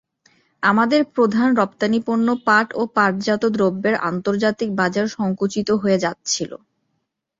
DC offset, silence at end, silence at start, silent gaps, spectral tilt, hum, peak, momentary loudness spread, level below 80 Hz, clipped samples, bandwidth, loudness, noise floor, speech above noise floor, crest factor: under 0.1%; 0.85 s; 0.6 s; none; -5 dB/octave; none; -2 dBFS; 5 LU; -60 dBFS; under 0.1%; 7.8 kHz; -19 LUFS; -74 dBFS; 55 dB; 16 dB